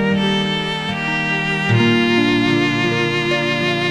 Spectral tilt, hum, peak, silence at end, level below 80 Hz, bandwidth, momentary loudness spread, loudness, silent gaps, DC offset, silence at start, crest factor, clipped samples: -5.5 dB/octave; none; -4 dBFS; 0 s; -46 dBFS; 13 kHz; 5 LU; -17 LUFS; none; under 0.1%; 0 s; 14 dB; under 0.1%